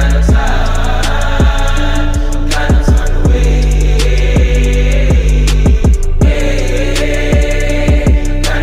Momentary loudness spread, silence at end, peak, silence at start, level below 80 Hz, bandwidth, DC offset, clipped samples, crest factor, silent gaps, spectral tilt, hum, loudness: 4 LU; 0 s; -2 dBFS; 0 s; -10 dBFS; 13.5 kHz; under 0.1%; under 0.1%; 8 dB; none; -5.5 dB/octave; none; -12 LUFS